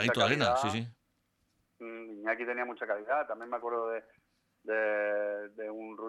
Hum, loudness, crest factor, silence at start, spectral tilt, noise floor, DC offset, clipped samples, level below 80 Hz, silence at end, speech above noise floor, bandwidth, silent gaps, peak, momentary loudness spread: none; -33 LUFS; 20 dB; 0 s; -4.5 dB/octave; -76 dBFS; under 0.1%; under 0.1%; -70 dBFS; 0 s; 44 dB; 13.5 kHz; none; -14 dBFS; 17 LU